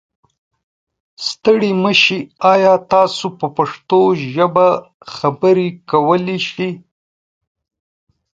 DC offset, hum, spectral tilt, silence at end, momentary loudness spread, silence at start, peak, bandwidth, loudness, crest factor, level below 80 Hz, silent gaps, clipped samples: under 0.1%; none; -5.5 dB/octave; 1.55 s; 11 LU; 1.2 s; 0 dBFS; 7.8 kHz; -15 LUFS; 16 dB; -60 dBFS; 4.94-5.00 s; under 0.1%